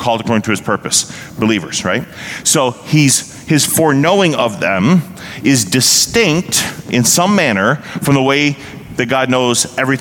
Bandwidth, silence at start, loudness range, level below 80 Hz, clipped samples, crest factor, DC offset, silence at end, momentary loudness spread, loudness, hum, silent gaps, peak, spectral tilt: 19 kHz; 0 s; 2 LU; -48 dBFS; under 0.1%; 14 dB; under 0.1%; 0 s; 8 LU; -13 LUFS; none; none; 0 dBFS; -3.5 dB/octave